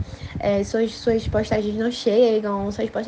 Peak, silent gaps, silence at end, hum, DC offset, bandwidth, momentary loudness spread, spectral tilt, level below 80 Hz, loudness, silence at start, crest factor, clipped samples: -6 dBFS; none; 0 s; none; under 0.1%; 9.2 kHz; 8 LU; -6 dB/octave; -40 dBFS; -22 LUFS; 0 s; 14 dB; under 0.1%